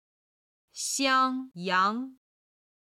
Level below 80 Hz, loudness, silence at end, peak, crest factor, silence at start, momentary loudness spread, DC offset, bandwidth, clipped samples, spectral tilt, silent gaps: -78 dBFS; -27 LUFS; 0.8 s; -12 dBFS; 18 dB; 0.75 s; 15 LU; under 0.1%; 15.5 kHz; under 0.1%; -2 dB/octave; none